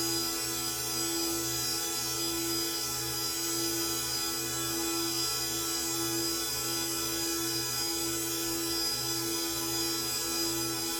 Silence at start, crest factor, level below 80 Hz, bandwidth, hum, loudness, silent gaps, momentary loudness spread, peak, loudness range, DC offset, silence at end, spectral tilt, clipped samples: 0 s; 14 dB; -56 dBFS; over 20 kHz; none; -30 LUFS; none; 1 LU; -18 dBFS; 0 LU; under 0.1%; 0 s; -1.5 dB/octave; under 0.1%